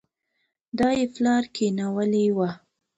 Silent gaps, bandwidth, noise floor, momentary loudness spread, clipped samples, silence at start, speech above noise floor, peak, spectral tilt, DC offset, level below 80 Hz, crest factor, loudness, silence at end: none; 8.2 kHz; -76 dBFS; 7 LU; under 0.1%; 0.75 s; 53 dB; -10 dBFS; -6 dB/octave; under 0.1%; -60 dBFS; 14 dB; -24 LUFS; 0.4 s